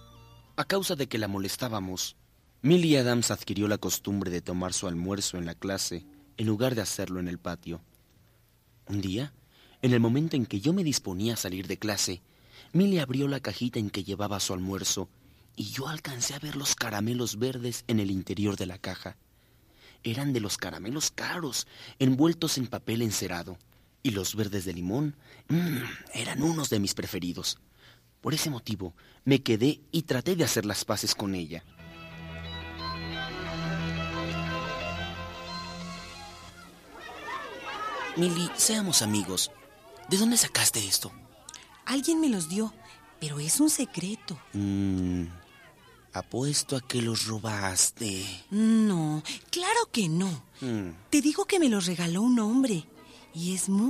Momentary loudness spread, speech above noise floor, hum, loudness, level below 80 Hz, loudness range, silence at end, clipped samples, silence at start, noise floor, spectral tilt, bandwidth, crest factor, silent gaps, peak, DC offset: 15 LU; 34 dB; none; -29 LUFS; -58 dBFS; 7 LU; 0 s; under 0.1%; 0 s; -63 dBFS; -4 dB/octave; 15.5 kHz; 20 dB; none; -8 dBFS; under 0.1%